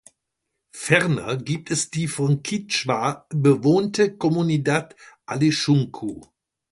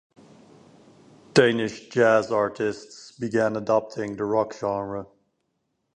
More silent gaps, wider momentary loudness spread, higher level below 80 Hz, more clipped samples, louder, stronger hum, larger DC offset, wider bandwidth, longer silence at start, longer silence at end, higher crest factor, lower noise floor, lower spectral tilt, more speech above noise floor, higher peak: neither; second, 10 LU vs 14 LU; about the same, -60 dBFS vs -62 dBFS; neither; about the same, -22 LUFS vs -24 LUFS; neither; neither; about the same, 11.5 kHz vs 10.5 kHz; second, 0.75 s vs 1.35 s; second, 0.45 s vs 0.9 s; about the same, 20 dB vs 22 dB; first, -79 dBFS vs -75 dBFS; about the same, -5 dB/octave vs -5.5 dB/octave; first, 58 dB vs 52 dB; about the same, -2 dBFS vs -2 dBFS